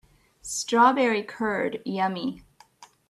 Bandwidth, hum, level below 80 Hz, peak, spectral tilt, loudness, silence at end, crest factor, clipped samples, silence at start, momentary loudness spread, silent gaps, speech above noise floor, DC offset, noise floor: 14 kHz; none; -64 dBFS; -6 dBFS; -3.5 dB/octave; -25 LUFS; 0.25 s; 20 dB; under 0.1%; 0.45 s; 13 LU; none; 30 dB; under 0.1%; -54 dBFS